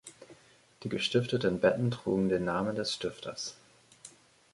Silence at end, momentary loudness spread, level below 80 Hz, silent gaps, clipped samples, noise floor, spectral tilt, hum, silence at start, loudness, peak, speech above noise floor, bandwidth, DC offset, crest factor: 0.45 s; 23 LU; -62 dBFS; none; under 0.1%; -59 dBFS; -5.5 dB/octave; none; 0.05 s; -31 LUFS; -12 dBFS; 29 dB; 11.5 kHz; under 0.1%; 20 dB